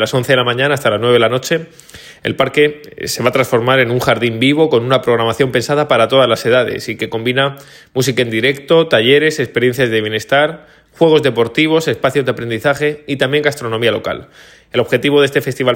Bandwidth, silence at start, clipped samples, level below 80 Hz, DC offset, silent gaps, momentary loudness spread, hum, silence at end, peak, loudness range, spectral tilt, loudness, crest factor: 17 kHz; 0 s; under 0.1%; -50 dBFS; under 0.1%; none; 8 LU; none; 0 s; 0 dBFS; 3 LU; -5 dB/octave; -14 LUFS; 14 dB